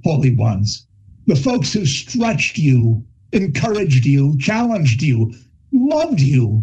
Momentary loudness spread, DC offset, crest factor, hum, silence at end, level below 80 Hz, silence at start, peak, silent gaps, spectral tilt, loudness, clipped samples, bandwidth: 6 LU; under 0.1%; 12 dB; none; 0 s; -46 dBFS; 0.05 s; -2 dBFS; none; -6.5 dB/octave; -17 LUFS; under 0.1%; 8.4 kHz